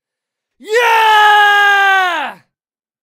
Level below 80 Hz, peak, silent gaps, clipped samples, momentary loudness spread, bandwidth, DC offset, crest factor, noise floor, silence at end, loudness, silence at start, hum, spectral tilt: -72 dBFS; 0 dBFS; none; under 0.1%; 10 LU; 16 kHz; under 0.1%; 12 dB; under -90 dBFS; 0.7 s; -9 LUFS; 0.65 s; none; 1 dB/octave